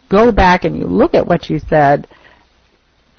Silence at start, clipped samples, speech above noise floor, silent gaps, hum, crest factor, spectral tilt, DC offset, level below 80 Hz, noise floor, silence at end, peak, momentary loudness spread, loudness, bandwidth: 0.1 s; under 0.1%; 43 dB; none; none; 12 dB; -7.5 dB/octave; under 0.1%; -30 dBFS; -55 dBFS; 1.15 s; 0 dBFS; 7 LU; -12 LUFS; 6.6 kHz